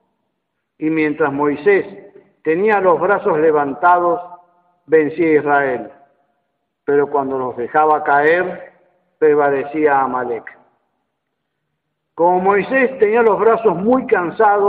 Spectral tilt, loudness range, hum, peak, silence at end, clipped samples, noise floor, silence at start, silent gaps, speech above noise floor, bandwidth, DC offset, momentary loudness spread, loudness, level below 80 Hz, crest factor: -9.5 dB/octave; 4 LU; none; -2 dBFS; 0 s; under 0.1%; -74 dBFS; 0.8 s; none; 59 dB; 4.6 kHz; under 0.1%; 9 LU; -15 LUFS; -60 dBFS; 14 dB